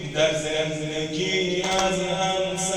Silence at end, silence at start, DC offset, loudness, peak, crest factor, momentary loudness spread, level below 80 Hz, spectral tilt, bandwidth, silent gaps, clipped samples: 0 s; 0 s; under 0.1%; -24 LUFS; -8 dBFS; 16 dB; 4 LU; -50 dBFS; -3.5 dB/octave; over 20 kHz; none; under 0.1%